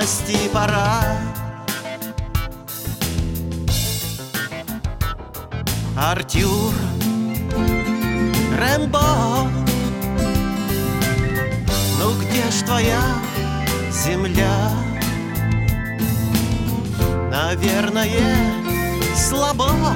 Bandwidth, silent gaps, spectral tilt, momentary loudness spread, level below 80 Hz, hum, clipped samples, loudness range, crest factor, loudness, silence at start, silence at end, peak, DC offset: 17 kHz; none; -5 dB/octave; 8 LU; -30 dBFS; none; under 0.1%; 5 LU; 18 dB; -20 LUFS; 0 s; 0 s; -2 dBFS; under 0.1%